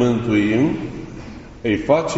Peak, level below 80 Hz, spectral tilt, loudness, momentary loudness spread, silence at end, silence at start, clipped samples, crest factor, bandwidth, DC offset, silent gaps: -2 dBFS; -42 dBFS; -6 dB/octave; -19 LUFS; 18 LU; 0 s; 0 s; under 0.1%; 16 dB; 8 kHz; under 0.1%; none